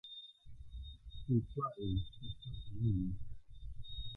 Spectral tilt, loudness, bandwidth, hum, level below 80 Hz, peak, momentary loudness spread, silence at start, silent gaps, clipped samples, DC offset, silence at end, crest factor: -10 dB/octave; -41 LUFS; 4.1 kHz; none; -50 dBFS; -22 dBFS; 18 LU; 0.05 s; none; under 0.1%; under 0.1%; 0 s; 18 dB